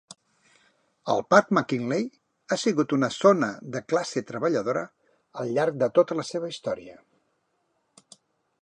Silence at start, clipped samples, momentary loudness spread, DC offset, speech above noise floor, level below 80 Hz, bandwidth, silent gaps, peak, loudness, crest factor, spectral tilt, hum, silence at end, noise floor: 1.05 s; under 0.1%; 15 LU; under 0.1%; 49 dB; -72 dBFS; 10.5 kHz; none; -2 dBFS; -25 LUFS; 24 dB; -5.5 dB/octave; none; 1.7 s; -73 dBFS